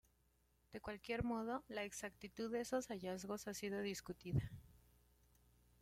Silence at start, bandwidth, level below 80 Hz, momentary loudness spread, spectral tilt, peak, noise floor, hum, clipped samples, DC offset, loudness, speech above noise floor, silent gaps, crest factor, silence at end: 0.7 s; 16.5 kHz; -66 dBFS; 9 LU; -5 dB/octave; -26 dBFS; -78 dBFS; none; under 0.1%; under 0.1%; -46 LUFS; 33 dB; none; 22 dB; 1.05 s